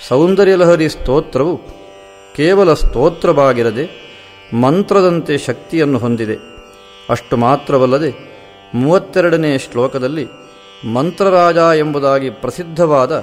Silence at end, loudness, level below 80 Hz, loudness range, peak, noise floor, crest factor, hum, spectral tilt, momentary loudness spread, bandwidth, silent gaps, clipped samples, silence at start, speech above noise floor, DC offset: 0 s; -13 LUFS; -30 dBFS; 3 LU; 0 dBFS; -38 dBFS; 14 dB; none; -6.5 dB/octave; 13 LU; 15 kHz; none; under 0.1%; 0 s; 25 dB; under 0.1%